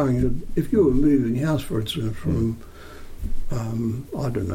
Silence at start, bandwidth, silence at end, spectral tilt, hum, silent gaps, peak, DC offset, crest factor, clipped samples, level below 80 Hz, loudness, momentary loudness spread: 0 s; 16 kHz; 0 s; -7.5 dB/octave; none; none; -8 dBFS; under 0.1%; 14 dB; under 0.1%; -32 dBFS; -23 LUFS; 17 LU